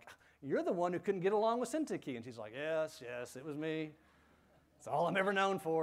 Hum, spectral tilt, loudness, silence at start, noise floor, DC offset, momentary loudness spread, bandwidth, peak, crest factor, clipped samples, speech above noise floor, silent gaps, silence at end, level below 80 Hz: none; -5.5 dB/octave; -37 LUFS; 0.05 s; -68 dBFS; under 0.1%; 13 LU; 15.5 kHz; -20 dBFS; 18 dB; under 0.1%; 32 dB; none; 0 s; -78 dBFS